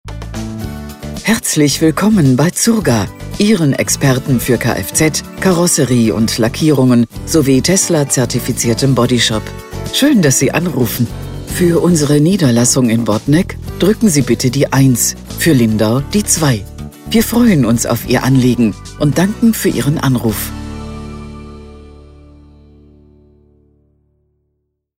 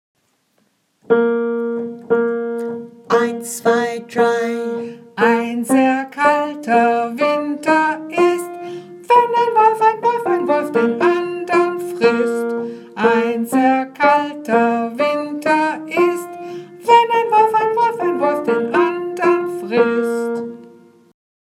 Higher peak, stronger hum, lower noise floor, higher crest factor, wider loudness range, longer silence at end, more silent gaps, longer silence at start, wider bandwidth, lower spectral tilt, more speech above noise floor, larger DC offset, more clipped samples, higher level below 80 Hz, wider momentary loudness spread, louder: about the same, 0 dBFS vs 0 dBFS; neither; first, -68 dBFS vs -63 dBFS; about the same, 14 dB vs 16 dB; about the same, 4 LU vs 3 LU; first, 3.1 s vs 0.9 s; neither; second, 0.05 s vs 1.1 s; about the same, 16.5 kHz vs 15.5 kHz; about the same, -5 dB/octave vs -4.5 dB/octave; first, 56 dB vs 47 dB; neither; neither; first, -34 dBFS vs -76 dBFS; first, 14 LU vs 11 LU; first, -12 LUFS vs -17 LUFS